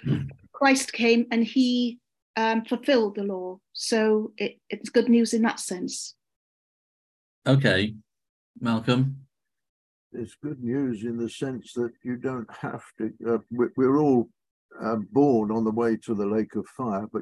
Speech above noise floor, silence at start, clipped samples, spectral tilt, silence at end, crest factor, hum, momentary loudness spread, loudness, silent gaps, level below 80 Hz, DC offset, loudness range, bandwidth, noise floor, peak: over 65 dB; 0.05 s; under 0.1%; -5.5 dB/octave; 0 s; 20 dB; none; 13 LU; -25 LUFS; 2.22-2.34 s, 6.36-7.42 s, 8.29-8.54 s, 9.69-10.10 s, 14.51-14.69 s; -60 dBFS; under 0.1%; 6 LU; 12.5 kHz; under -90 dBFS; -6 dBFS